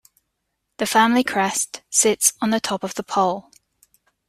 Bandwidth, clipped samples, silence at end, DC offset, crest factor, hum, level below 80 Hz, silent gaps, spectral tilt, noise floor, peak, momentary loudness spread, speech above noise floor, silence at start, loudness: 15.5 kHz; under 0.1%; 0.9 s; under 0.1%; 20 dB; none; -62 dBFS; none; -2 dB/octave; -76 dBFS; -2 dBFS; 9 LU; 56 dB; 0.8 s; -19 LUFS